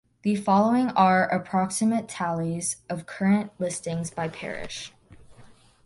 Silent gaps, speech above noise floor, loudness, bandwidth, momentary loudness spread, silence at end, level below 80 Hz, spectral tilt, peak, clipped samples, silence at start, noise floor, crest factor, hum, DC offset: none; 27 dB; -25 LUFS; 11.5 kHz; 14 LU; 0.4 s; -60 dBFS; -5 dB/octave; -8 dBFS; under 0.1%; 0.25 s; -52 dBFS; 18 dB; none; under 0.1%